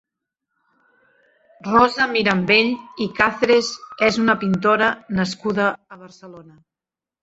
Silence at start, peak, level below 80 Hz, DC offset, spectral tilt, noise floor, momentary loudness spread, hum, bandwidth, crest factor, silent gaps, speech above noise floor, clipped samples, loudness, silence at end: 1.65 s; -2 dBFS; -54 dBFS; under 0.1%; -5 dB/octave; -89 dBFS; 10 LU; none; 8 kHz; 20 dB; none; 70 dB; under 0.1%; -18 LUFS; 0.8 s